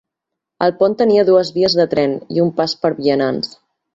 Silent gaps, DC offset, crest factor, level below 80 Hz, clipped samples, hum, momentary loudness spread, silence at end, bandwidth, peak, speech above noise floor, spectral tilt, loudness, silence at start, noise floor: none; under 0.1%; 14 dB; -56 dBFS; under 0.1%; none; 6 LU; 0.5 s; 7.8 kHz; -2 dBFS; 66 dB; -6 dB/octave; -16 LUFS; 0.6 s; -81 dBFS